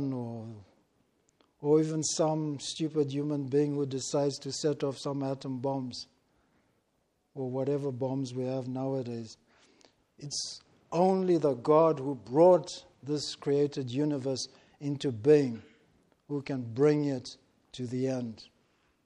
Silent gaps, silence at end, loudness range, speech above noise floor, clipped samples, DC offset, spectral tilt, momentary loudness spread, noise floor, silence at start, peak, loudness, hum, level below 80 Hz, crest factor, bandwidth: none; 0.6 s; 9 LU; 46 dB; under 0.1%; under 0.1%; -6 dB/octave; 17 LU; -75 dBFS; 0 s; -10 dBFS; -30 LUFS; none; -74 dBFS; 20 dB; 11 kHz